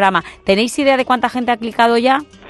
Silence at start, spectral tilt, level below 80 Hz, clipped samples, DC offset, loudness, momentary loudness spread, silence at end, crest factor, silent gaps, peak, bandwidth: 0 s; -4 dB/octave; -50 dBFS; under 0.1%; under 0.1%; -15 LUFS; 5 LU; 0 s; 14 dB; none; 0 dBFS; 12.5 kHz